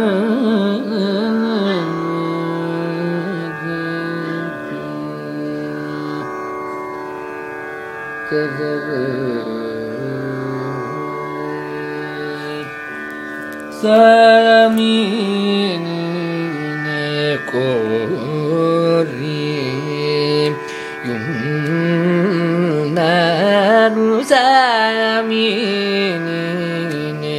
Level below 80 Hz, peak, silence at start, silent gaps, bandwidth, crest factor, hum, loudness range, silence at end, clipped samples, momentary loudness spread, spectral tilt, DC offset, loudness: -62 dBFS; 0 dBFS; 0 s; none; 15.5 kHz; 16 dB; none; 11 LU; 0 s; under 0.1%; 14 LU; -6 dB/octave; under 0.1%; -17 LUFS